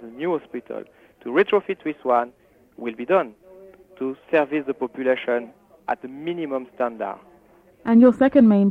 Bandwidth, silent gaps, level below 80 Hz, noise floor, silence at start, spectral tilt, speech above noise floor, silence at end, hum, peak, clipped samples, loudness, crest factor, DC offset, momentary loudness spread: 4.3 kHz; none; -62 dBFS; -54 dBFS; 0 s; -8.5 dB/octave; 33 dB; 0 s; none; -4 dBFS; under 0.1%; -22 LUFS; 18 dB; under 0.1%; 18 LU